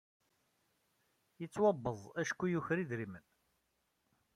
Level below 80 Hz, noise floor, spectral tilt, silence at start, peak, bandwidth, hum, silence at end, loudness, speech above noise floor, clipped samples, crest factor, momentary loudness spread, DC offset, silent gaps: -74 dBFS; -81 dBFS; -6.5 dB/octave; 1.4 s; -20 dBFS; 14 kHz; none; 1.15 s; -37 LUFS; 45 dB; under 0.1%; 20 dB; 15 LU; under 0.1%; none